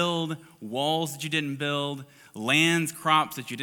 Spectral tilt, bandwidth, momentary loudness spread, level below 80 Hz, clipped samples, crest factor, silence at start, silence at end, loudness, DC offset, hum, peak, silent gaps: -4 dB/octave; 19 kHz; 13 LU; -76 dBFS; under 0.1%; 20 dB; 0 s; 0 s; -26 LUFS; under 0.1%; none; -6 dBFS; none